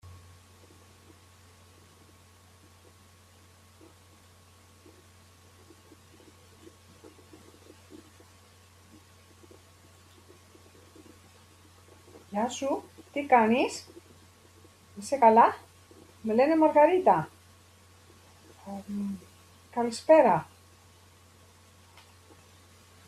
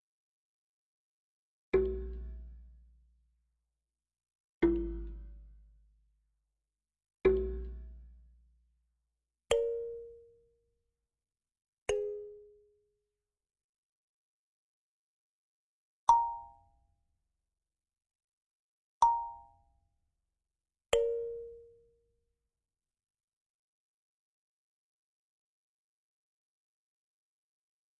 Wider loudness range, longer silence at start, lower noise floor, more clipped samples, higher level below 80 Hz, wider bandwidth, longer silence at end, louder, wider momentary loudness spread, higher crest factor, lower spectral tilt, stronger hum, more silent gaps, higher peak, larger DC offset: about the same, 9 LU vs 8 LU; second, 0.05 s vs 1.75 s; second, -57 dBFS vs under -90 dBFS; neither; second, -74 dBFS vs -52 dBFS; first, 14 kHz vs 7.4 kHz; second, 2.65 s vs 6.35 s; first, -25 LUFS vs -33 LUFS; about the same, 23 LU vs 22 LU; about the same, 24 dB vs 28 dB; about the same, -5.5 dB/octave vs -4.5 dB/octave; neither; second, none vs 4.35-4.61 s, 11.68-11.73 s, 11.82-11.86 s, 13.64-16.07 s, 18.24-19.01 s; first, -8 dBFS vs -12 dBFS; neither